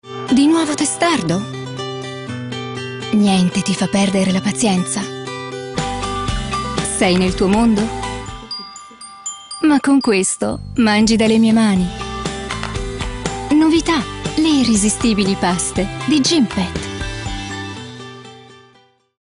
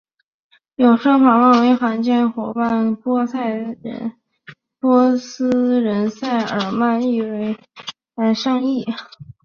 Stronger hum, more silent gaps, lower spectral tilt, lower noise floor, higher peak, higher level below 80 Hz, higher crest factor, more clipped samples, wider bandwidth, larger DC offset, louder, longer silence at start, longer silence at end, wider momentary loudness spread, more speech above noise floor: neither; neither; second, -4.5 dB/octave vs -6 dB/octave; first, -53 dBFS vs -45 dBFS; about the same, -2 dBFS vs -2 dBFS; first, -36 dBFS vs -62 dBFS; about the same, 16 dB vs 16 dB; neither; first, 11 kHz vs 6.8 kHz; neither; about the same, -17 LUFS vs -17 LUFS; second, 0.05 s vs 0.8 s; first, 0.65 s vs 0.2 s; about the same, 14 LU vs 15 LU; first, 38 dB vs 28 dB